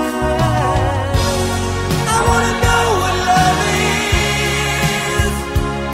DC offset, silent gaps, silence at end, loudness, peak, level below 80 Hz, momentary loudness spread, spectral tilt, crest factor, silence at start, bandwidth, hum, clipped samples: under 0.1%; none; 0 s; -15 LUFS; -2 dBFS; -26 dBFS; 5 LU; -4 dB/octave; 14 dB; 0 s; 16 kHz; none; under 0.1%